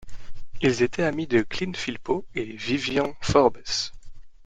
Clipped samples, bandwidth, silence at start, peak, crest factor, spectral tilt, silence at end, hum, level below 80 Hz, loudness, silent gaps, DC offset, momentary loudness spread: under 0.1%; 9.4 kHz; 0 s; -4 dBFS; 22 dB; -4.5 dB/octave; 0 s; none; -44 dBFS; -25 LUFS; none; under 0.1%; 10 LU